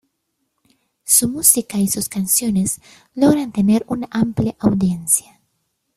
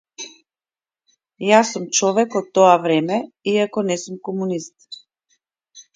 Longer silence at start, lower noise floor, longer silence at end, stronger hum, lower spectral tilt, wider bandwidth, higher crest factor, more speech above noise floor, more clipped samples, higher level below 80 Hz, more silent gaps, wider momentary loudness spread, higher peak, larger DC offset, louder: first, 1.05 s vs 0.2 s; second, -72 dBFS vs under -90 dBFS; first, 0.75 s vs 0.15 s; neither; about the same, -4.5 dB/octave vs -4 dB/octave; first, 16 kHz vs 9.6 kHz; about the same, 20 dB vs 20 dB; second, 55 dB vs over 72 dB; neither; first, -50 dBFS vs -70 dBFS; neither; second, 9 LU vs 21 LU; about the same, 0 dBFS vs 0 dBFS; neither; about the same, -17 LUFS vs -18 LUFS